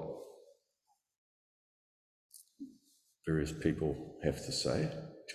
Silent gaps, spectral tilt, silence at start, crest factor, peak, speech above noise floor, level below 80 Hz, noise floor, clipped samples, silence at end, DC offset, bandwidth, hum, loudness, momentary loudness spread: 1.18-2.30 s; -5.5 dB/octave; 0 s; 24 dB; -16 dBFS; 44 dB; -56 dBFS; -80 dBFS; under 0.1%; 0 s; under 0.1%; 14.5 kHz; none; -37 LUFS; 19 LU